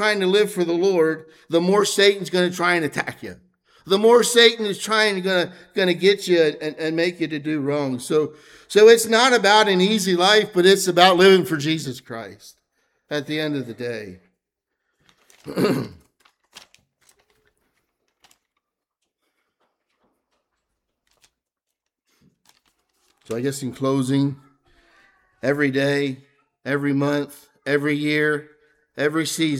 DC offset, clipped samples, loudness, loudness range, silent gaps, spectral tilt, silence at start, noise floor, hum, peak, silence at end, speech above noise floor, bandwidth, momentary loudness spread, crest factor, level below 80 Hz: under 0.1%; under 0.1%; -19 LUFS; 15 LU; none; -4 dB/octave; 0 s; -82 dBFS; none; 0 dBFS; 0 s; 63 dB; 16.5 kHz; 16 LU; 22 dB; -68 dBFS